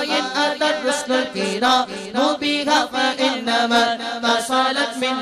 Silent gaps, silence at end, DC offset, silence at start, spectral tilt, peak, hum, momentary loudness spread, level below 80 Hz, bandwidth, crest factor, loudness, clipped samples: none; 0 s; under 0.1%; 0 s; -2 dB/octave; -6 dBFS; none; 4 LU; -62 dBFS; 14 kHz; 14 dB; -19 LUFS; under 0.1%